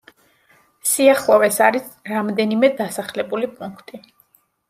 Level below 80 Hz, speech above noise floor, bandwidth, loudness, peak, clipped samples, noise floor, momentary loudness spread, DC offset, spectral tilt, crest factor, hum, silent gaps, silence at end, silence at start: -66 dBFS; 41 dB; 16 kHz; -18 LUFS; -2 dBFS; under 0.1%; -59 dBFS; 13 LU; under 0.1%; -3.5 dB/octave; 18 dB; none; none; 0.7 s; 0.85 s